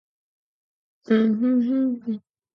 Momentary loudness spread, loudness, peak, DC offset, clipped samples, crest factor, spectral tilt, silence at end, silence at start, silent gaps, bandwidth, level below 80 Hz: 11 LU; -22 LUFS; -8 dBFS; under 0.1%; under 0.1%; 16 dB; -9 dB/octave; 0.35 s; 1.1 s; none; 5.6 kHz; -76 dBFS